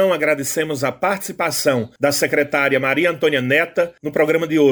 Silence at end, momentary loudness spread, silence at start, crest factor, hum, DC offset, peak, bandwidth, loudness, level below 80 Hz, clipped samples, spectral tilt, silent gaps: 0 s; 5 LU; 0 s; 14 dB; none; under 0.1%; -4 dBFS; over 20 kHz; -18 LUFS; -60 dBFS; under 0.1%; -4 dB/octave; none